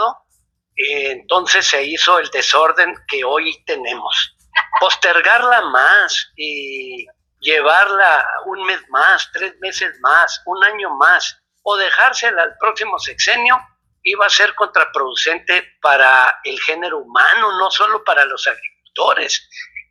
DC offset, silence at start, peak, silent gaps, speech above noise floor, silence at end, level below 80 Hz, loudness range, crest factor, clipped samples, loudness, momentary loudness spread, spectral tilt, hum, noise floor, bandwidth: under 0.1%; 0 s; 0 dBFS; none; 49 dB; 0.1 s; -64 dBFS; 2 LU; 16 dB; under 0.1%; -14 LUFS; 11 LU; 1 dB/octave; none; -64 dBFS; 12 kHz